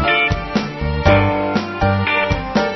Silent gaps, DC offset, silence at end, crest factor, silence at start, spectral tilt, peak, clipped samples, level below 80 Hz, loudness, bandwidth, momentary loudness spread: none; 0.1%; 0 s; 16 dB; 0 s; -6.5 dB/octave; 0 dBFS; under 0.1%; -30 dBFS; -17 LUFS; 6.2 kHz; 7 LU